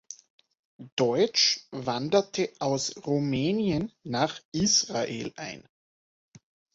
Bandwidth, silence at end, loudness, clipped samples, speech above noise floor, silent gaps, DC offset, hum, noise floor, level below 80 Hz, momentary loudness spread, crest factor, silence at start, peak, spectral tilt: 8 kHz; 1.15 s; -27 LUFS; under 0.1%; over 63 dB; 0.30-0.38 s, 0.59-0.79 s, 0.92-0.97 s, 4.45-4.52 s; under 0.1%; none; under -90 dBFS; -60 dBFS; 14 LU; 20 dB; 0.1 s; -10 dBFS; -3.5 dB/octave